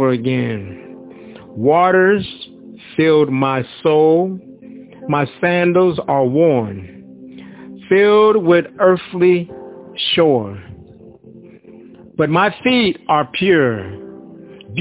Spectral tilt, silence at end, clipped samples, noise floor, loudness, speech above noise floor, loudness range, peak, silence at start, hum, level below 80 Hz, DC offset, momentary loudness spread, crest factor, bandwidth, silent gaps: -10.5 dB/octave; 0 s; under 0.1%; -41 dBFS; -15 LUFS; 27 dB; 4 LU; 0 dBFS; 0 s; none; -52 dBFS; under 0.1%; 22 LU; 16 dB; 4 kHz; none